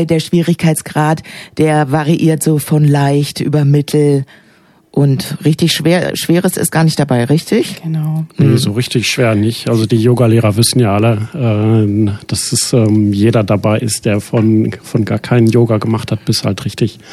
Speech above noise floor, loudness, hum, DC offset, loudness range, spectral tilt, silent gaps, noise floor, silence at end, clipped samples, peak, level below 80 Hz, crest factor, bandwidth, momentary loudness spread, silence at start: 33 dB; -13 LUFS; none; under 0.1%; 2 LU; -6 dB/octave; none; -45 dBFS; 0 s; under 0.1%; 0 dBFS; -48 dBFS; 12 dB; 14.5 kHz; 6 LU; 0 s